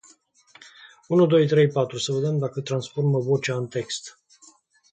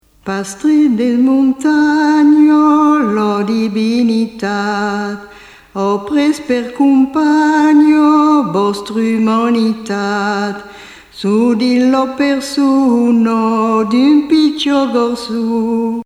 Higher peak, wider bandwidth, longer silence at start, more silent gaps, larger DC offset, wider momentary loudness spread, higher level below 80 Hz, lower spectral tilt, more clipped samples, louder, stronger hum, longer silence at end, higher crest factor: second, -8 dBFS vs 0 dBFS; second, 9.2 kHz vs 12 kHz; first, 0.8 s vs 0.25 s; neither; neither; about the same, 11 LU vs 9 LU; second, -68 dBFS vs -52 dBFS; about the same, -6 dB/octave vs -5.5 dB/octave; neither; second, -23 LUFS vs -12 LUFS; neither; first, 0.85 s vs 0 s; about the same, 16 dB vs 12 dB